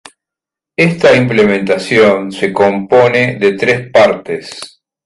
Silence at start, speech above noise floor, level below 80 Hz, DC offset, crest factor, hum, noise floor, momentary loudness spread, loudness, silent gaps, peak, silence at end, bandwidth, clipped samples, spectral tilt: 0.8 s; 74 dB; -50 dBFS; under 0.1%; 12 dB; none; -85 dBFS; 13 LU; -11 LUFS; none; 0 dBFS; 0.4 s; 11.5 kHz; under 0.1%; -6 dB/octave